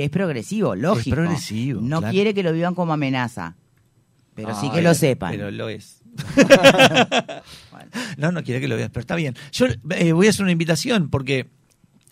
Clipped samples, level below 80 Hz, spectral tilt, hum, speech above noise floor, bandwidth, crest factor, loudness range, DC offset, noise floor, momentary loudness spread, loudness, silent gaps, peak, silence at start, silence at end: under 0.1%; -50 dBFS; -5 dB/octave; none; 41 dB; 16 kHz; 20 dB; 7 LU; under 0.1%; -60 dBFS; 17 LU; -19 LUFS; none; 0 dBFS; 0 s; 0.65 s